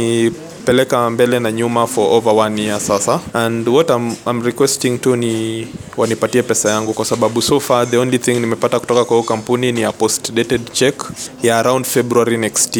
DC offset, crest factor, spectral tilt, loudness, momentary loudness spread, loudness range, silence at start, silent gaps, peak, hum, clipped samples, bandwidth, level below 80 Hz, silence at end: under 0.1%; 14 dB; -4 dB/octave; -15 LUFS; 5 LU; 1 LU; 0 s; none; 0 dBFS; none; under 0.1%; 19.5 kHz; -52 dBFS; 0 s